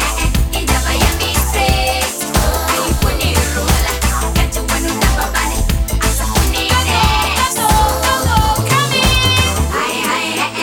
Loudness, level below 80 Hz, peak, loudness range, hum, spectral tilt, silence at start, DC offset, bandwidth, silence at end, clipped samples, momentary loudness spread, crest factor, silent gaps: -14 LUFS; -18 dBFS; 0 dBFS; 3 LU; none; -3.5 dB/octave; 0 s; under 0.1%; over 20 kHz; 0 s; under 0.1%; 4 LU; 14 dB; none